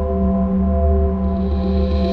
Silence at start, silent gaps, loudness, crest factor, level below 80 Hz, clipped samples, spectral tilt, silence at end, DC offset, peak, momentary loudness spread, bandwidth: 0 s; none; -18 LUFS; 10 dB; -20 dBFS; under 0.1%; -11 dB/octave; 0 s; 2%; -6 dBFS; 3 LU; 4.9 kHz